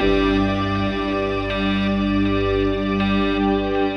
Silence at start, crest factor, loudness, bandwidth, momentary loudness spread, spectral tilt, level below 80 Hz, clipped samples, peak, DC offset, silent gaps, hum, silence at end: 0 s; 12 dB; -20 LUFS; 6.6 kHz; 3 LU; -7.5 dB/octave; -32 dBFS; under 0.1%; -6 dBFS; under 0.1%; none; 50 Hz at -40 dBFS; 0 s